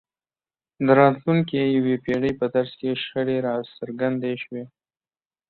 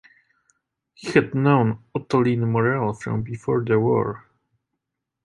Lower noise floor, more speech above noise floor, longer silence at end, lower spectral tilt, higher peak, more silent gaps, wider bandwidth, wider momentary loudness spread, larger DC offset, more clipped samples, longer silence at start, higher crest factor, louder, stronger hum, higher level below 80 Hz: first, under -90 dBFS vs -82 dBFS; first, over 68 dB vs 61 dB; second, 0.85 s vs 1.05 s; about the same, -9 dB/octave vs -8 dB/octave; about the same, -4 dBFS vs -2 dBFS; neither; second, 4.5 kHz vs 11.5 kHz; first, 13 LU vs 10 LU; neither; neither; second, 0.8 s vs 1 s; about the same, 20 dB vs 20 dB; about the same, -22 LUFS vs -22 LUFS; neither; about the same, -60 dBFS vs -56 dBFS